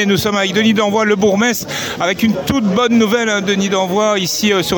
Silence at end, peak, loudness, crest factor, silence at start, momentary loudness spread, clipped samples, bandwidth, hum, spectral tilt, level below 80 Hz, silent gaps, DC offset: 0 s; -2 dBFS; -14 LUFS; 12 dB; 0 s; 3 LU; under 0.1%; 19.5 kHz; none; -4 dB/octave; -46 dBFS; none; under 0.1%